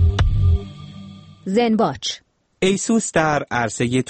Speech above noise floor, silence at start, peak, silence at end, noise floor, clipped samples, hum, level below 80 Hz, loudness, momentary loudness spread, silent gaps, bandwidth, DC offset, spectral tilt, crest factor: 20 dB; 0 s; -4 dBFS; 0.05 s; -39 dBFS; under 0.1%; none; -28 dBFS; -20 LUFS; 19 LU; none; 8.8 kHz; under 0.1%; -5.5 dB/octave; 16 dB